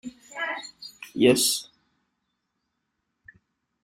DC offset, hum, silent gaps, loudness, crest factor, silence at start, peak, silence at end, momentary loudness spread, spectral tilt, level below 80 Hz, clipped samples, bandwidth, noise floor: under 0.1%; none; none; -24 LUFS; 22 dB; 0.05 s; -6 dBFS; 2.2 s; 21 LU; -3 dB/octave; -68 dBFS; under 0.1%; 16 kHz; -79 dBFS